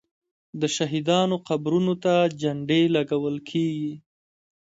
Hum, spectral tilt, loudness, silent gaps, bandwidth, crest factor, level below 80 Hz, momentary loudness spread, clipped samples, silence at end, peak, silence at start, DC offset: none; -5.5 dB/octave; -24 LUFS; none; 8 kHz; 16 dB; -66 dBFS; 9 LU; under 0.1%; 0.7 s; -8 dBFS; 0.55 s; under 0.1%